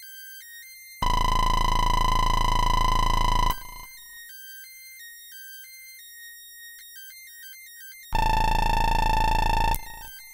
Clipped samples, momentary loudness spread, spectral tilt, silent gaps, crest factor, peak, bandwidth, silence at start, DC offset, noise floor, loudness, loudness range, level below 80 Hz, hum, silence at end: under 0.1%; 18 LU; -3.5 dB/octave; none; 14 dB; -10 dBFS; 16.5 kHz; 0 s; under 0.1%; -45 dBFS; -25 LUFS; 16 LU; -28 dBFS; none; 0 s